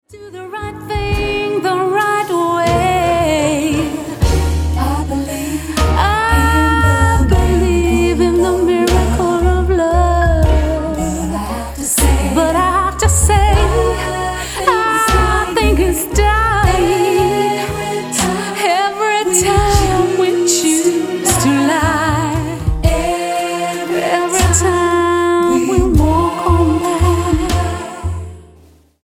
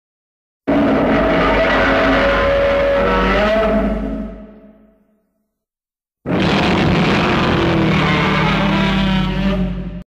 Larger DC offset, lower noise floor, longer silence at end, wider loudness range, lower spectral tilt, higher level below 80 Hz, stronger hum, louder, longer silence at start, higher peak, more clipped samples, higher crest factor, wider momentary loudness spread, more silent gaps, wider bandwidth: neither; second, -46 dBFS vs under -90 dBFS; first, 0.6 s vs 0.05 s; second, 2 LU vs 7 LU; second, -5 dB/octave vs -6.5 dB/octave; first, -20 dBFS vs -28 dBFS; neither; about the same, -14 LUFS vs -15 LUFS; second, 0.1 s vs 0.65 s; about the same, 0 dBFS vs -2 dBFS; neither; about the same, 14 dB vs 14 dB; about the same, 7 LU vs 8 LU; neither; first, 17.5 kHz vs 9.6 kHz